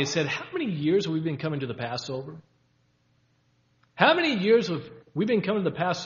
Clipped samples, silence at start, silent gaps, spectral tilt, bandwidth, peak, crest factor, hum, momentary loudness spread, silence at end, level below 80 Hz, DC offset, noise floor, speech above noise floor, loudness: under 0.1%; 0 s; none; -5.5 dB/octave; 7.4 kHz; -2 dBFS; 24 dB; none; 13 LU; 0 s; -68 dBFS; under 0.1%; -67 dBFS; 42 dB; -26 LUFS